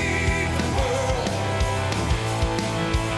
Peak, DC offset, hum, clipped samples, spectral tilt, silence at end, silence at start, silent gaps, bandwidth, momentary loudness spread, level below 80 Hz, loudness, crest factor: -10 dBFS; under 0.1%; none; under 0.1%; -5 dB/octave; 0 s; 0 s; none; 12 kHz; 2 LU; -32 dBFS; -24 LUFS; 12 dB